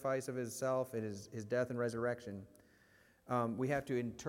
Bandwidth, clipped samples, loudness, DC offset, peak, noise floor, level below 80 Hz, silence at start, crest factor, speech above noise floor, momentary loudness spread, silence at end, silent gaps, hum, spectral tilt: 16.5 kHz; under 0.1%; -39 LUFS; under 0.1%; -22 dBFS; -68 dBFS; -74 dBFS; 0 s; 18 dB; 30 dB; 8 LU; 0 s; none; none; -6 dB/octave